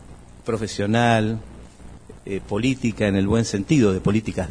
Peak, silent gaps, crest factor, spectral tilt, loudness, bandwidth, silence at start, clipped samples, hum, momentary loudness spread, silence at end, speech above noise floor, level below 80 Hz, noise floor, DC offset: -4 dBFS; none; 18 dB; -6 dB/octave; -22 LUFS; 10.5 kHz; 0 s; under 0.1%; none; 13 LU; 0 s; 21 dB; -44 dBFS; -42 dBFS; under 0.1%